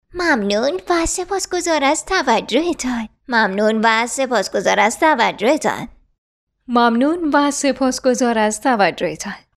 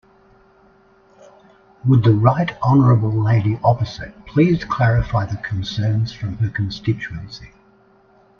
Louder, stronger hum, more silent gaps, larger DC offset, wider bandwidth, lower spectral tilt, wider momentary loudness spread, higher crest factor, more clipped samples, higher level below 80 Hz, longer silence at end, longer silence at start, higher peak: about the same, -17 LUFS vs -18 LUFS; neither; first, 6.18-6.47 s vs none; neither; first, 14.5 kHz vs 6.6 kHz; second, -3 dB/octave vs -8.5 dB/octave; second, 7 LU vs 12 LU; about the same, 16 dB vs 18 dB; neither; about the same, -44 dBFS vs -40 dBFS; second, 0.2 s vs 0.95 s; second, 0.15 s vs 1.85 s; about the same, -2 dBFS vs 0 dBFS